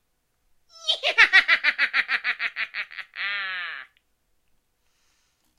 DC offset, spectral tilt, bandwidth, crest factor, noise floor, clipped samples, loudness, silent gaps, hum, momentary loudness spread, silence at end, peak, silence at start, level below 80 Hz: under 0.1%; 1.5 dB/octave; 13 kHz; 24 dB; -70 dBFS; under 0.1%; -21 LUFS; none; none; 17 LU; 1.75 s; -2 dBFS; 0.8 s; -66 dBFS